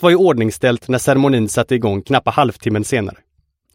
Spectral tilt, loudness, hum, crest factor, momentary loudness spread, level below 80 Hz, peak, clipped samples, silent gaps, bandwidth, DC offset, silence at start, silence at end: -5.5 dB/octave; -16 LUFS; none; 16 dB; 7 LU; -50 dBFS; 0 dBFS; under 0.1%; none; 16.5 kHz; under 0.1%; 0 s; 0.65 s